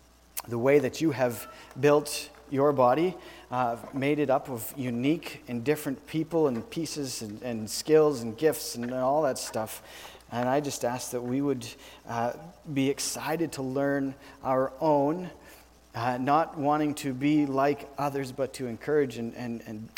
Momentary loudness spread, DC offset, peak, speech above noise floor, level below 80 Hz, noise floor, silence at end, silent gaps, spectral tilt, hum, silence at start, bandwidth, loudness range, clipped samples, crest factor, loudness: 12 LU; under 0.1%; -10 dBFS; 25 dB; -62 dBFS; -53 dBFS; 0.1 s; none; -5 dB/octave; none; 0.35 s; 19 kHz; 4 LU; under 0.1%; 18 dB; -28 LUFS